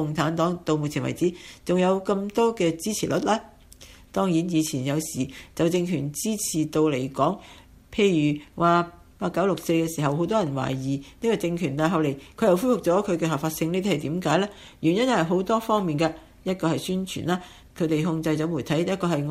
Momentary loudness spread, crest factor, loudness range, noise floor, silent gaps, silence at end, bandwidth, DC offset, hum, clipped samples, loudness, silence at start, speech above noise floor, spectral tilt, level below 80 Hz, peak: 7 LU; 18 dB; 2 LU; -48 dBFS; none; 0 s; 15.5 kHz; under 0.1%; none; under 0.1%; -25 LUFS; 0 s; 24 dB; -5.5 dB/octave; -54 dBFS; -6 dBFS